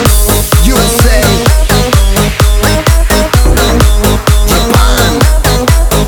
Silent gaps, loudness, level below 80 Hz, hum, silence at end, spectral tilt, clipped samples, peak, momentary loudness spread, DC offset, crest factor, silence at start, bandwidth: none; -8 LUFS; -10 dBFS; none; 0 s; -4.5 dB/octave; 1%; 0 dBFS; 2 LU; under 0.1%; 6 dB; 0 s; over 20 kHz